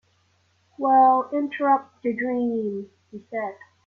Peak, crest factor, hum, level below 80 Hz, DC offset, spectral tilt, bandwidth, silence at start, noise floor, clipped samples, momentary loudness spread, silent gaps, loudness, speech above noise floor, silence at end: -6 dBFS; 18 dB; none; -72 dBFS; under 0.1%; -8 dB/octave; 4.1 kHz; 0.8 s; -65 dBFS; under 0.1%; 17 LU; none; -23 LUFS; 43 dB; 0.3 s